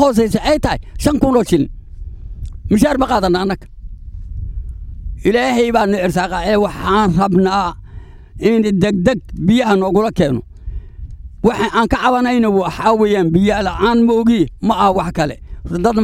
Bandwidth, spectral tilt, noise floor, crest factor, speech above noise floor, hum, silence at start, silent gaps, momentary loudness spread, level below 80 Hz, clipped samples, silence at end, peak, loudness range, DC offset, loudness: 16 kHz; -6.5 dB/octave; -34 dBFS; 14 dB; 20 dB; none; 0 s; none; 18 LU; -30 dBFS; under 0.1%; 0 s; 0 dBFS; 4 LU; under 0.1%; -15 LUFS